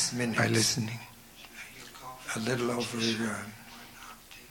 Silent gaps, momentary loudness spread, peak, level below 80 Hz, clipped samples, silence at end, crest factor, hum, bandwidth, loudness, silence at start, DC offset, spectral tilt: none; 21 LU; -12 dBFS; -62 dBFS; under 0.1%; 0 s; 20 dB; none; 19 kHz; -30 LUFS; 0 s; under 0.1%; -3.5 dB/octave